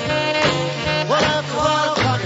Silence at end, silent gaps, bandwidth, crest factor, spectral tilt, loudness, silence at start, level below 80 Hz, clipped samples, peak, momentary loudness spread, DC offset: 0 s; none; 8 kHz; 16 dB; -4.5 dB/octave; -18 LUFS; 0 s; -44 dBFS; under 0.1%; -4 dBFS; 3 LU; under 0.1%